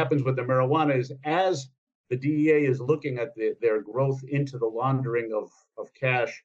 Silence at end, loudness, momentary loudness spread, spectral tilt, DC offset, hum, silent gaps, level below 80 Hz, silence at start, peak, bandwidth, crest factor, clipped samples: 0.05 s; -26 LUFS; 11 LU; -7.5 dB/octave; under 0.1%; none; 1.78-1.87 s, 1.95-2.04 s; -76 dBFS; 0 s; -10 dBFS; 7.8 kHz; 16 dB; under 0.1%